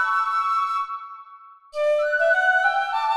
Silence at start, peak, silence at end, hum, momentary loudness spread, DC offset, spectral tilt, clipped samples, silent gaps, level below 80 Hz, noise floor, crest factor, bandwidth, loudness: 0 s; -8 dBFS; 0 s; none; 17 LU; under 0.1%; 1.5 dB/octave; under 0.1%; none; -72 dBFS; -47 dBFS; 14 dB; 12 kHz; -21 LUFS